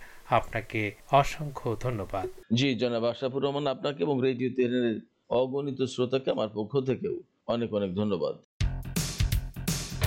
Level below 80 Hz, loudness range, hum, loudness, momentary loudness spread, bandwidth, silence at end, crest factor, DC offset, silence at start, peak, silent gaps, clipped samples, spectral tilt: -42 dBFS; 2 LU; none; -30 LUFS; 7 LU; 16.5 kHz; 0 s; 22 dB; under 0.1%; 0 s; -8 dBFS; 8.44-8.60 s; under 0.1%; -5.5 dB/octave